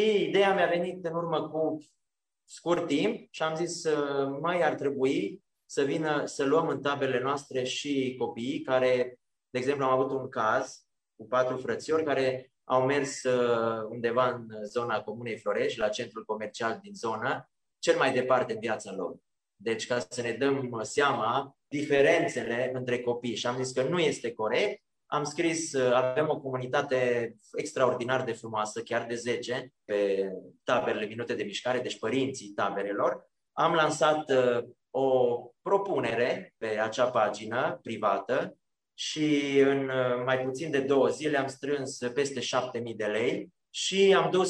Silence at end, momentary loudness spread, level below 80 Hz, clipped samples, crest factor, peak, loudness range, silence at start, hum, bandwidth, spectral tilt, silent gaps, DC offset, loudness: 0 s; 9 LU; -74 dBFS; under 0.1%; 18 dB; -10 dBFS; 3 LU; 0 s; none; 10.5 kHz; -4.5 dB/octave; none; under 0.1%; -29 LUFS